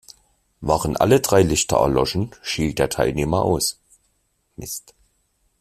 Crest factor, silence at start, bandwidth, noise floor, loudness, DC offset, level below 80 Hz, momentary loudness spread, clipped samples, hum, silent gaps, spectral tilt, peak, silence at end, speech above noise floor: 18 dB; 0.6 s; 16 kHz; -68 dBFS; -20 LUFS; under 0.1%; -40 dBFS; 15 LU; under 0.1%; none; none; -4.5 dB/octave; -2 dBFS; 0.8 s; 48 dB